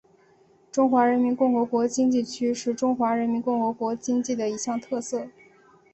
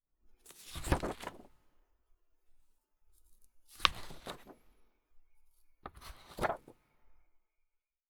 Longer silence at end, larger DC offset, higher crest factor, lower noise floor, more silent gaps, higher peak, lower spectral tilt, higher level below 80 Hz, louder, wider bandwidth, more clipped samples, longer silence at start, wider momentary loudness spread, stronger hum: second, 0.65 s vs 0.95 s; neither; second, 18 dB vs 42 dB; second, -59 dBFS vs -80 dBFS; neither; second, -8 dBFS vs -2 dBFS; about the same, -4.5 dB/octave vs -3.5 dB/octave; second, -68 dBFS vs -52 dBFS; first, -25 LUFS vs -37 LUFS; second, 8.4 kHz vs over 20 kHz; neither; first, 0.75 s vs 0.25 s; second, 9 LU vs 22 LU; neither